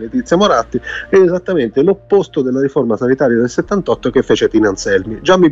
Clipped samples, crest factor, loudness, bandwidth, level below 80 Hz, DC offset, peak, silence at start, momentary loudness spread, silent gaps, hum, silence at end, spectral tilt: under 0.1%; 12 dB; -14 LUFS; 7.8 kHz; -40 dBFS; under 0.1%; 0 dBFS; 0 s; 5 LU; none; none; 0 s; -5.5 dB/octave